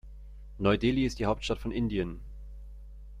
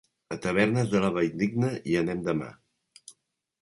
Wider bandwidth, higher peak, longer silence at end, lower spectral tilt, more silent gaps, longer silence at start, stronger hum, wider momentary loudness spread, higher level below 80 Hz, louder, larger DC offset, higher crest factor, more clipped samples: about the same, 12 kHz vs 11.5 kHz; second, -12 dBFS vs -8 dBFS; second, 0 s vs 0.5 s; about the same, -6.5 dB/octave vs -6.5 dB/octave; neither; second, 0.05 s vs 0.3 s; neither; first, 23 LU vs 9 LU; first, -42 dBFS vs -58 dBFS; second, -30 LUFS vs -27 LUFS; neither; about the same, 20 dB vs 20 dB; neither